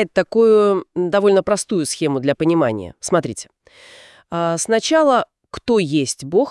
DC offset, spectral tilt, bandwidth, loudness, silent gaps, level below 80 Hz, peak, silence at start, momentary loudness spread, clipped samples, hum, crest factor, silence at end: under 0.1%; -4.5 dB/octave; 12 kHz; -17 LUFS; none; -56 dBFS; -4 dBFS; 0 s; 10 LU; under 0.1%; none; 14 dB; 0 s